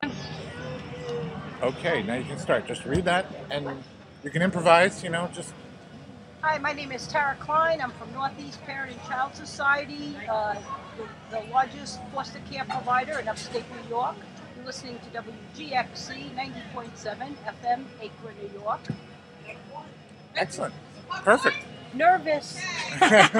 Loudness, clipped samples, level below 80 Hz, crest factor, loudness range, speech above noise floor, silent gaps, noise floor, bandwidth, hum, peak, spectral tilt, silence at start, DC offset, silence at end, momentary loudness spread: -27 LUFS; under 0.1%; -58 dBFS; 28 dB; 9 LU; 20 dB; none; -47 dBFS; 11.5 kHz; none; 0 dBFS; -4 dB/octave; 0 s; under 0.1%; 0 s; 19 LU